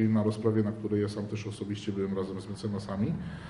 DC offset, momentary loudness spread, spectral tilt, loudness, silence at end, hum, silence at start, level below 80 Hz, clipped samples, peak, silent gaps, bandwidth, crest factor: under 0.1%; 9 LU; -8 dB/octave; -32 LUFS; 0 s; none; 0 s; -56 dBFS; under 0.1%; -14 dBFS; none; 11 kHz; 18 dB